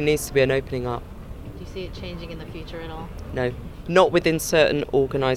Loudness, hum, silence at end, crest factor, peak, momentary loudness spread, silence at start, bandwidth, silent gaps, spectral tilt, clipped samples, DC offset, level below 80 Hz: -22 LUFS; none; 0 s; 20 dB; -2 dBFS; 17 LU; 0 s; 16.5 kHz; none; -5 dB/octave; under 0.1%; under 0.1%; -40 dBFS